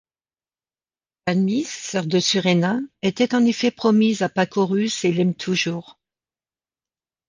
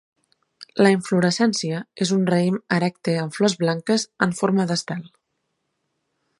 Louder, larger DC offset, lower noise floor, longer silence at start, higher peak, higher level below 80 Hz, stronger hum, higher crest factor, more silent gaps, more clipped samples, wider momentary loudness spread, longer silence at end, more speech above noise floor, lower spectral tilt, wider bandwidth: about the same, -21 LUFS vs -21 LUFS; neither; first, under -90 dBFS vs -75 dBFS; first, 1.25 s vs 0.6 s; second, -6 dBFS vs -2 dBFS; about the same, -66 dBFS vs -68 dBFS; neither; about the same, 16 dB vs 20 dB; neither; neither; about the same, 8 LU vs 7 LU; about the same, 1.35 s vs 1.3 s; first, over 70 dB vs 54 dB; about the same, -5 dB/octave vs -5 dB/octave; second, 9.8 kHz vs 11.5 kHz